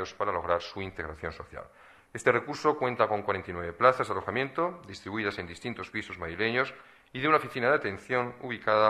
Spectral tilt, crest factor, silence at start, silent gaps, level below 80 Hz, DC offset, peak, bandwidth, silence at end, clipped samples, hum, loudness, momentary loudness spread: -5.5 dB/octave; 22 dB; 0 s; none; -58 dBFS; under 0.1%; -6 dBFS; 13 kHz; 0 s; under 0.1%; none; -30 LUFS; 12 LU